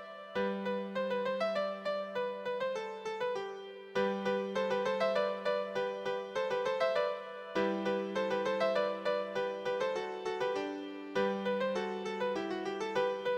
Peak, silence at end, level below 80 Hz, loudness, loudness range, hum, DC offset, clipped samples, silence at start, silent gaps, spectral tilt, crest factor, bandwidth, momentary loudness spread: -18 dBFS; 0 s; -76 dBFS; -35 LUFS; 3 LU; none; under 0.1%; under 0.1%; 0 s; none; -5.5 dB/octave; 16 dB; 9.4 kHz; 6 LU